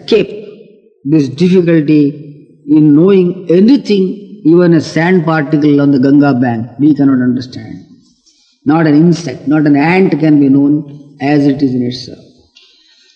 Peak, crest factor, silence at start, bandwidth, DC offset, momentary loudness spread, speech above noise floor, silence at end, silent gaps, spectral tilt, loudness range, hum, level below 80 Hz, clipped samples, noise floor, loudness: 0 dBFS; 10 dB; 0.1 s; 7.8 kHz; under 0.1%; 11 LU; 42 dB; 1 s; none; -8 dB/octave; 3 LU; none; -54 dBFS; 0.4%; -51 dBFS; -10 LUFS